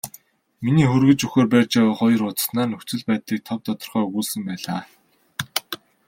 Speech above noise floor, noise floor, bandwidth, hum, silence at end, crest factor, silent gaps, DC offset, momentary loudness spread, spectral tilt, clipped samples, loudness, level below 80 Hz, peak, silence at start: 31 dB; -50 dBFS; 16.5 kHz; none; 0.35 s; 20 dB; none; under 0.1%; 12 LU; -5.5 dB/octave; under 0.1%; -21 LUFS; -58 dBFS; -2 dBFS; 0.05 s